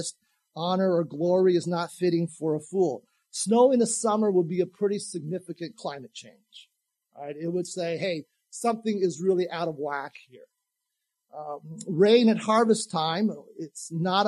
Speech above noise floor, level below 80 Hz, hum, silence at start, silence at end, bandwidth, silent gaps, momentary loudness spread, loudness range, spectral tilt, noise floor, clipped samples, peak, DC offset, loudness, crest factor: 57 dB; -80 dBFS; none; 0 s; 0 s; 12.5 kHz; none; 18 LU; 8 LU; -5 dB/octave; -83 dBFS; under 0.1%; -8 dBFS; under 0.1%; -26 LUFS; 18 dB